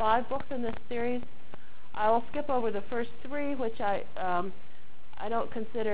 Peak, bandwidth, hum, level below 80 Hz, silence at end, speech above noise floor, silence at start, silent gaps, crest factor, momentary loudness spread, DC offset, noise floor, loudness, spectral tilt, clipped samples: -14 dBFS; 4 kHz; none; -58 dBFS; 0 s; 22 dB; 0 s; none; 20 dB; 13 LU; 4%; -54 dBFS; -33 LUFS; -9 dB/octave; under 0.1%